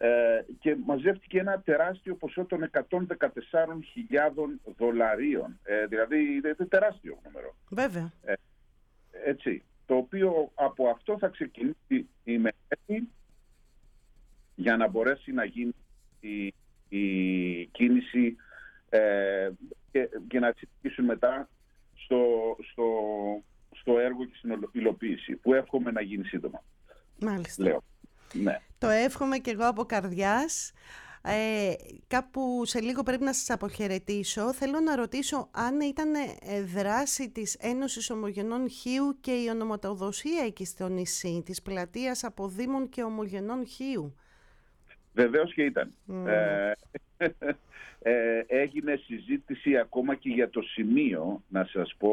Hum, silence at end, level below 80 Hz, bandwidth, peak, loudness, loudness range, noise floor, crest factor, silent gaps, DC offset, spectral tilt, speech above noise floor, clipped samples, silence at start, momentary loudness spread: none; 0 s; -58 dBFS; 17 kHz; -12 dBFS; -30 LUFS; 4 LU; -62 dBFS; 18 dB; none; under 0.1%; -4.5 dB/octave; 33 dB; under 0.1%; 0 s; 10 LU